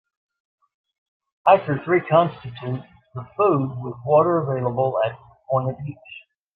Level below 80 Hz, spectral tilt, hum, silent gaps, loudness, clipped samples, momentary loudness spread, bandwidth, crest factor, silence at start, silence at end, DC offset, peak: -62 dBFS; -10.5 dB/octave; none; none; -21 LUFS; under 0.1%; 18 LU; 4.8 kHz; 20 dB; 1.45 s; 0.35 s; under 0.1%; -2 dBFS